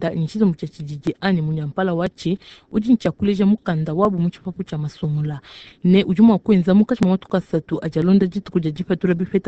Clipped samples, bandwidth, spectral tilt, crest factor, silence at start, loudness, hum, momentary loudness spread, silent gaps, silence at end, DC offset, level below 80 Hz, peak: under 0.1%; 8 kHz; -8.5 dB/octave; 16 dB; 0 s; -19 LUFS; none; 12 LU; none; 0 s; under 0.1%; -50 dBFS; -2 dBFS